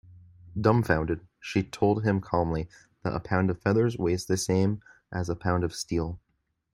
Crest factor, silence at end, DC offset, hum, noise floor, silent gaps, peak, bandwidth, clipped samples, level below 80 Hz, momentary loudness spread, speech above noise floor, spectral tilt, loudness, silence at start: 22 dB; 0.55 s; under 0.1%; none; -51 dBFS; none; -6 dBFS; 15.5 kHz; under 0.1%; -50 dBFS; 12 LU; 24 dB; -6.5 dB/octave; -28 LUFS; 0.1 s